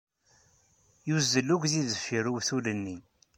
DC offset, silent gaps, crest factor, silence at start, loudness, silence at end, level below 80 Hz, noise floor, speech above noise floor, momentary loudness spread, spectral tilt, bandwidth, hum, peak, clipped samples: under 0.1%; none; 20 dB; 1.05 s; -29 LUFS; 0.4 s; -68 dBFS; -66 dBFS; 37 dB; 14 LU; -4 dB/octave; 16 kHz; none; -12 dBFS; under 0.1%